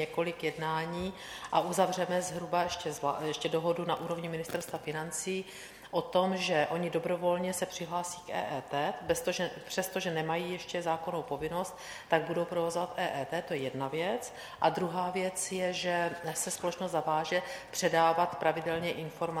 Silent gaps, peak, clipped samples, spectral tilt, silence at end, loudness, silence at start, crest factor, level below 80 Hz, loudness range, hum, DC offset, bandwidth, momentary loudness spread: none; -12 dBFS; under 0.1%; -4 dB/octave; 0 s; -33 LUFS; 0 s; 22 dB; -64 dBFS; 3 LU; none; under 0.1%; 18 kHz; 7 LU